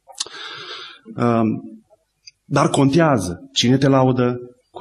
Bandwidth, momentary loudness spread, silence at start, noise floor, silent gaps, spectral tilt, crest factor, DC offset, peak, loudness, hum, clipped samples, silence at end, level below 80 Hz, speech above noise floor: 12.5 kHz; 17 LU; 0.2 s; -55 dBFS; none; -5.5 dB/octave; 16 dB; under 0.1%; -4 dBFS; -18 LUFS; none; under 0.1%; 0 s; -54 dBFS; 38 dB